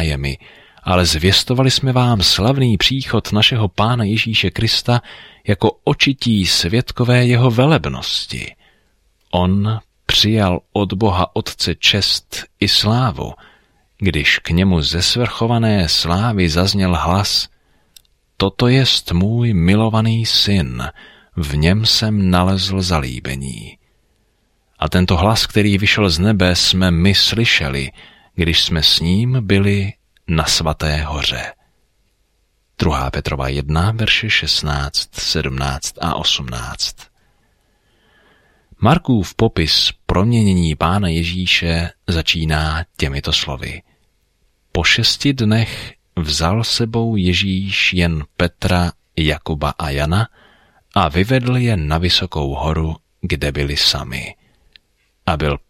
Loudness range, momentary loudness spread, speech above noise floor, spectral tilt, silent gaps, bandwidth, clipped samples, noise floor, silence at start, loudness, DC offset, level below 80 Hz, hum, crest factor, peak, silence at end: 5 LU; 10 LU; 46 dB; -4.5 dB/octave; none; 16.5 kHz; under 0.1%; -62 dBFS; 0 s; -16 LUFS; under 0.1%; -32 dBFS; none; 16 dB; 0 dBFS; 0.1 s